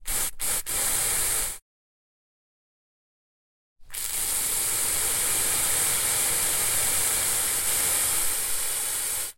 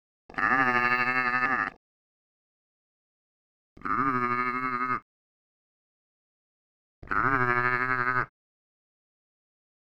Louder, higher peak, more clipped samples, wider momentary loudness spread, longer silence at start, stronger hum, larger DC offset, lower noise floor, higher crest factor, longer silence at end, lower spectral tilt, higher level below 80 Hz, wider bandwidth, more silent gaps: first, -23 LUFS vs -26 LUFS; about the same, -10 dBFS vs -10 dBFS; neither; second, 5 LU vs 9 LU; second, 0 s vs 0.3 s; neither; neither; about the same, under -90 dBFS vs under -90 dBFS; about the same, 18 dB vs 22 dB; second, 0.05 s vs 1.7 s; second, 0.5 dB/octave vs -6.5 dB/octave; first, -48 dBFS vs -58 dBFS; second, 16.5 kHz vs 19.5 kHz; second, 1.62-3.76 s vs 1.77-3.76 s, 5.02-7.02 s